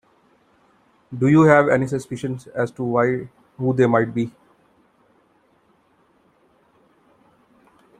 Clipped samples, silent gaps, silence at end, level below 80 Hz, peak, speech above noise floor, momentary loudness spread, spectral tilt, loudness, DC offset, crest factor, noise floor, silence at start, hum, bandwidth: under 0.1%; none; 3.7 s; -60 dBFS; -2 dBFS; 42 dB; 15 LU; -8 dB/octave; -19 LUFS; under 0.1%; 20 dB; -60 dBFS; 1.1 s; none; 10.5 kHz